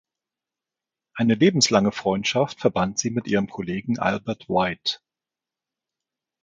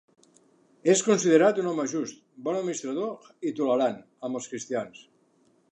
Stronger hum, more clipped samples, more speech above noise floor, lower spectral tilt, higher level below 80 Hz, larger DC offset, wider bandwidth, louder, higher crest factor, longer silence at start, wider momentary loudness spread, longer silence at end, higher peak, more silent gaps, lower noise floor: neither; neither; first, 67 dB vs 39 dB; about the same, -4.5 dB/octave vs -4.5 dB/octave; first, -56 dBFS vs -80 dBFS; neither; second, 9.4 kHz vs 10.5 kHz; first, -22 LUFS vs -27 LUFS; about the same, 20 dB vs 20 dB; first, 1.15 s vs 0.85 s; second, 10 LU vs 14 LU; first, 1.45 s vs 0.7 s; about the same, -4 dBFS vs -6 dBFS; neither; first, -89 dBFS vs -65 dBFS